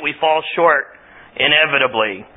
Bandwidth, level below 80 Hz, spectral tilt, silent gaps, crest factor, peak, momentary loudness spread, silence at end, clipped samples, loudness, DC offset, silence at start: 4 kHz; -60 dBFS; -8.5 dB/octave; none; 18 dB; 0 dBFS; 10 LU; 0.1 s; under 0.1%; -15 LUFS; under 0.1%; 0 s